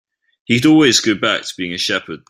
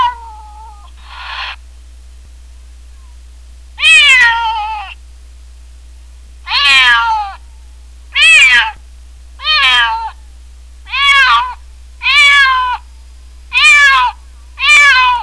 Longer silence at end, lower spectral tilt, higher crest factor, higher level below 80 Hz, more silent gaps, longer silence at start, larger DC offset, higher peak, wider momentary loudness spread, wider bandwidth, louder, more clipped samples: about the same, 0.1 s vs 0 s; first, -3.5 dB/octave vs 1.5 dB/octave; first, 16 dB vs 10 dB; second, -54 dBFS vs -34 dBFS; neither; first, 0.5 s vs 0 s; second, under 0.1% vs 0.5%; about the same, 0 dBFS vs -2 dBFS; second, 10 LU vs 19 LU; first, 14 kHz vs 11 kHz; second, -14 LUFS vs -7 LUFS; neither